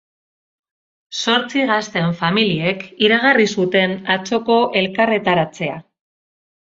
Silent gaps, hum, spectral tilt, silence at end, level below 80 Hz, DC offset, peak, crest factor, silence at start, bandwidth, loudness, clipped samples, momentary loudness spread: none; none; -5 dB/octave; 0.85 s; -58 dBFS; under 0.1%; -2 dBFS; 16 dB; 1.1 s; 7.8 kHz; -17 LUFS; under 0.1%; 9 LU